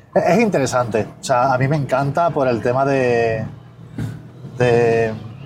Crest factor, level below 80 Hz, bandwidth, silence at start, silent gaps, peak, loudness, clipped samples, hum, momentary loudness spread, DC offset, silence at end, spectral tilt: 14 dB; -50 dBFS; 15 kHz; 0.15 s; none; -4 dBFS; -17 LUFS; under 0.1%; none; 14 LU; under 0.1%; 0 s; -6.5 dB/octave